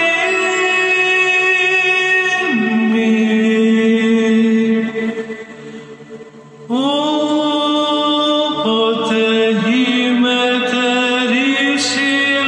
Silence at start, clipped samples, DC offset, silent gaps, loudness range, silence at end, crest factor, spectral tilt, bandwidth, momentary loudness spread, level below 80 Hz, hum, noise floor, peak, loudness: 0 s; under 0.1%; under 0.1%; none; 5 LU; 0 s; 10 dB; -4 dB/octave; 10 kHz; 9 LU; -64 dBFS; none; -36 dBFS; -4 dBFS; -14 LUFS